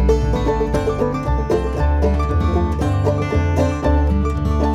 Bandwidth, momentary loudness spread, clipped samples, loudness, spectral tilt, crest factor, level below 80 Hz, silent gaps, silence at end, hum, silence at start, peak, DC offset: 10.5 kHz; 2 LU; under 0.1%; -19 LUFS; -8 dB/octave; 12 dB; -20 dBFS; none; 0 s; none; 0 s; -4 dBFS; under 0.1%